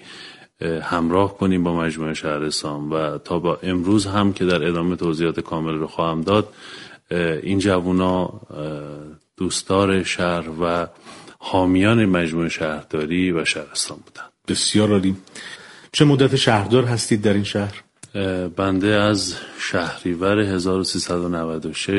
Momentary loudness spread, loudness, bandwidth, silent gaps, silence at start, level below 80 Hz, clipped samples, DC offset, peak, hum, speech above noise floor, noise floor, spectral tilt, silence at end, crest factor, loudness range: 15 LU; -20 LUFS; 11.5 kHz; none; 0.05 s; -50 dBFS; under 0.1%; under 0.1%; 0 dBFS; none; 21 dB; -41 dBFS; -5 dB/octave; 0 s; 20 dB; 3 LU